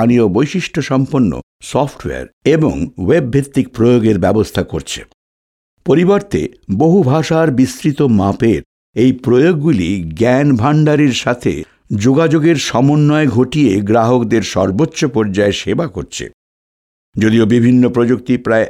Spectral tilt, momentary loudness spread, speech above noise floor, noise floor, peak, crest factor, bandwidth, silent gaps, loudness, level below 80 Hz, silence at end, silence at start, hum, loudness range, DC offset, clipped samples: -6.5 dB/octave; 9 LU; over 78 dB; under -90 dBFS; -2 dBFS; 12 dB; 14 kHz; 1.43-1.60 s, 2.33-2.41 s, 5.14-5.77 s, 8.66-8.93 s, 16.34-17.13 s; -13 LUFS; -42 dBFS; 0 s; 0 s; none; 3 LU; under 0.1%; under 0.1%